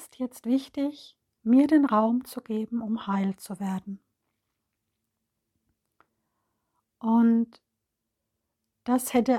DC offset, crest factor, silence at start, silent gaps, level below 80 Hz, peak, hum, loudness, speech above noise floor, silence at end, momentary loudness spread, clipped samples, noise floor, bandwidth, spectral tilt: under 0.1%; 18 dB; 0 s; none; -72 dBFS; -10 dBFS; none; -26 LUFS; 58 dB; 0 s; 14 LU; under 0.1%; -83 dBFS; 16 kHz; -6 dB/octave